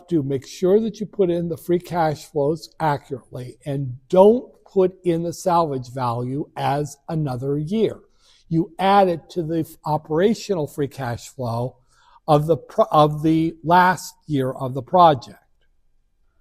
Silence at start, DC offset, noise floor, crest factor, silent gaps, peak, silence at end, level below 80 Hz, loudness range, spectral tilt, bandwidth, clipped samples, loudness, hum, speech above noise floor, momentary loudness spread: 0.1 s; under 0.1%; -61 dBFS; 20 dB; none; 0 dBFS; 1.05 s; -52 dBFS; 5 LU; -7 dB/octave; 15.5 kHz; under 0.1%; -21 LUFS; none; 41 dB; 12 LU